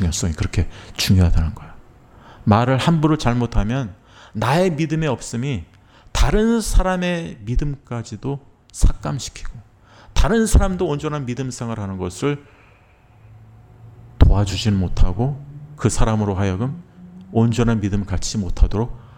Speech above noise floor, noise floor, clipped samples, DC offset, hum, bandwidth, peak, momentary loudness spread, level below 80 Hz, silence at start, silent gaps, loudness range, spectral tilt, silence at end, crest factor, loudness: 32 dB; -51 dBFS; under 0.1%; under 0.1%; none; 16 kHz; 0 dBFS; 12 LU; -24 dBFS; 0 s; none; 5 LU; -6 dB/octave; 0.1 s; 18 dB; -21 LUFS